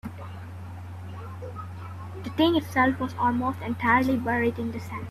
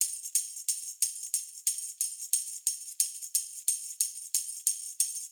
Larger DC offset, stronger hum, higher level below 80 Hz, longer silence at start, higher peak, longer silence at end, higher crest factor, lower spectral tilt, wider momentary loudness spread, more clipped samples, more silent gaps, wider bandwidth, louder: neither; neither; first, -58 dBFS vs under -90 dBFS; about the same, 0.05 s vs 0 s; about the same, -8 dBFS vs -6 dBFS; about the same, 0 s vs 0 s; second, 18 dB vs 28 dB; first, -6.5 dB/octave vs 10 dB/octave; first, 17 LU vs 4 LU; neither; neither; second, 14 kHz vs over 20 kHz; first, -25 LUFS vs -30 LUFS